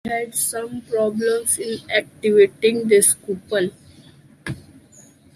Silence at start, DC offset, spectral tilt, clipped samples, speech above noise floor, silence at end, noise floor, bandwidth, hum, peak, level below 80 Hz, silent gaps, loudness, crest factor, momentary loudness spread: 0.05 s; under 0.1%; -3 dB/octave; under 0.1%; 30 dB; 0.75 s; -49 dBFS; 15.5 kHz; none; -4 dBFS; -60 dBFS; none; -19 LUFS; 18 dB; 18 LU